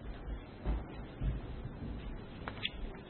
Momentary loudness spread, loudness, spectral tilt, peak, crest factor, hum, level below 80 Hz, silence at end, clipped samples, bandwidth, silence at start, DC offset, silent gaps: 6 LU; -43 LUFS; -4.5 dB/octave; -20 dBFS; 20 dB; none; -44 dBFS; 0 s; under 0.1%; 4.3 kHz; 0 s; under 0.1%; none